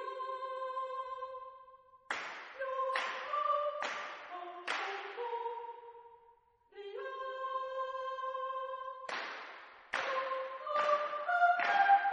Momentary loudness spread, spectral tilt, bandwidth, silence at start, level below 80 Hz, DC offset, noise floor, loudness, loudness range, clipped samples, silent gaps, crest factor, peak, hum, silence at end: 17 LU; -1 dB/octave; 9 kHz; 0 s; -86 dBFS; under 0.1%; -66 dBFS; -36 LUFS; 7 LU; under 0.1%; none; 20 dB; -16 dBFS; none; 0 s